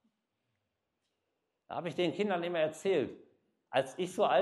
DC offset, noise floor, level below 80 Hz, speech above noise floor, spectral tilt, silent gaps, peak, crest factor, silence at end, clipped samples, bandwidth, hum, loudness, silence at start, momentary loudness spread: under 0.1%; -84 dBFS; -82 dBFS; 52 dB; -5 dB/octave; none; -16 dBFS; 20 dB; 0 s; under 0.1%; 12 kHz; none; -34 LUFS; 1.7 s; 9 LU